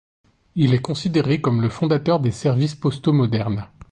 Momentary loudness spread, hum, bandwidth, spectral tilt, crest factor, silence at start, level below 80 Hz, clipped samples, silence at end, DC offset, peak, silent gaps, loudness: 4 LU; none; 9.6 kHz; -7.5 dB/octave; 14 dB; 0.55 s; -50 dBFS; under 0.1%; 0.25 s; under 0.1%; -6 dBFS; none; -20 LUFS